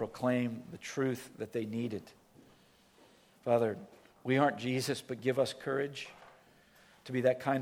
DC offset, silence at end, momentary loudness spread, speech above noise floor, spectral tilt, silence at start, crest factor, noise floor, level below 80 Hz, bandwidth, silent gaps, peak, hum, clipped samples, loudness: under 0.1%; 0 s; 14 LU; 31 dB; -5.5 dB/octave; 0 s; 22 dB; -64 dBFS; -76 dBFS; 17 kHz; none; -14 dBFS; none; under 0.1%; -34 LUFS